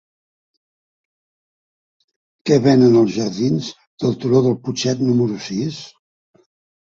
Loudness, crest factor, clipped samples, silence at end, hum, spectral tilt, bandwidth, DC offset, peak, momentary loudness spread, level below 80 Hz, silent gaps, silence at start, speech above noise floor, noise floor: -17 LUFS; 18 dB; under 0.1%; 0.95 s; none; -6.5 dB/octave; 7.6 kHz; under 0.1%; -2 dBFS; 13 LU; -58 dBFS; 3.87-3.98 s; 2.45 s; over 74 dB; under -90 dBFS